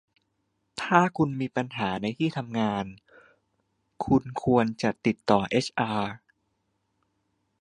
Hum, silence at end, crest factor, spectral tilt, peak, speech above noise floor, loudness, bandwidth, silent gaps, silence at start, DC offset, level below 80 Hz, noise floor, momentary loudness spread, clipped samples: none; 1.45 s; 26 dB; -6.5 dB/octave; -2 dBFS; 50 dB; -27 LUFS; 11 kHz; none; 0.75 s; under 0.1%; -58 dBFS; -76 dBFS; 12 LU; under 0.1%